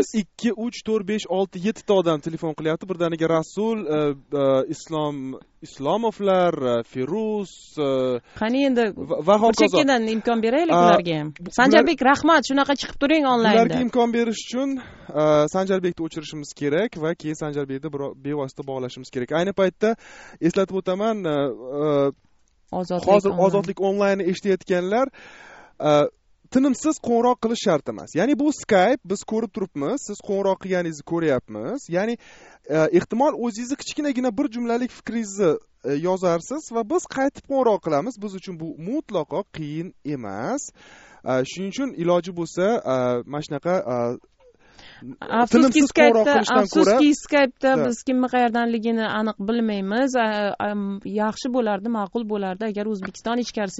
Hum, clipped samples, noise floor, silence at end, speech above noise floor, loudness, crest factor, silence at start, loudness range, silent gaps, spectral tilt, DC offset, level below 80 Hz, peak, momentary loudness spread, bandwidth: none; under 0.1%; -54 dBFS; 0 s; 33 dB; -22 LUFS; 22 dB; 0 s; 7 LU; none; -4.5 dB/octave; under 0.1%; -56 dBFS; 0 dBFS; 12 LU; 8 kHz